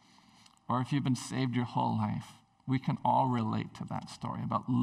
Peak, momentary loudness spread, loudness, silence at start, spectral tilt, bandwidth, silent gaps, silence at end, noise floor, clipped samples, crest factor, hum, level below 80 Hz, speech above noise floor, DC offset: -16 dBFS; 11 LU; -33 LUFS; 0.7 s; -7 dB/octave; 12.5 kHz; none; 0 s; -61 dBFS; under 0.1%; 18 dB; none; -66 dBFS; 30 dB; under 0.1%